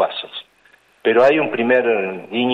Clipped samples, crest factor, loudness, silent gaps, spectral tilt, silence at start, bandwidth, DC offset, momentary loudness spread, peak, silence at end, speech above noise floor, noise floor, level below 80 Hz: under 0.1%; 14 dB; -17 LUFS; none; -6 dB/octave; 0 s; 7.6 kHz; under 0.1%; 15 LU; -4 dBFS; 0 s; 38 dB; -54 dBFS; -66 dBFS